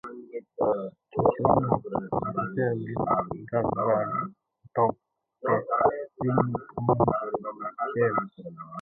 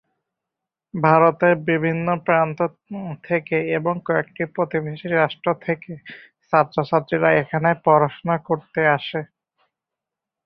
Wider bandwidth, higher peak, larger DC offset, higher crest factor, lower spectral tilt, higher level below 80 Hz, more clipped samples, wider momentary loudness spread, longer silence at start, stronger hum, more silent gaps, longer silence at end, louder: second, 3.8 kHz vs 5.6 kHz; second, -6 dBFS vs -2 dBFS; neither; about the same, 20 dB vs 20 dB; first, -11.5 dB/octave vs -9.5 dB/octave; first, -54 dBFS vs -62 dBFS; neither; about the same, 10 LU vs 12 LU; second, 0.05 s vs 0.95 s; neither; neither; second, 0 s vs 1.2 s; second, -27 LUFS vs -20 LUFS